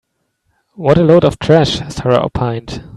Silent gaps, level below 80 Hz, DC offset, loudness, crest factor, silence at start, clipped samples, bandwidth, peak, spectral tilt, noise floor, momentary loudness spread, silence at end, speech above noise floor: none; -38 dBFS; under 0.1%; -13 LUFS; 14 dB; 0.8 s; under 0.1%; 11.5 kHz; 0 dBFS; -6.5 dB/octave; -65 dBFS; 10 LU; 0 s; 53 dB